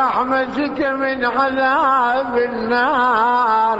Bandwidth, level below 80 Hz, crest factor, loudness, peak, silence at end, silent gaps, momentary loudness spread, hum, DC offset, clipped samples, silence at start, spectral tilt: 8 kHz; -52 dBFS; 12 dB; -17 LUFS; -4 dBFS; 0 s; none; 5 LU; none; under 0.1%; under 0.1%; 0 s; -5.5 dB/octave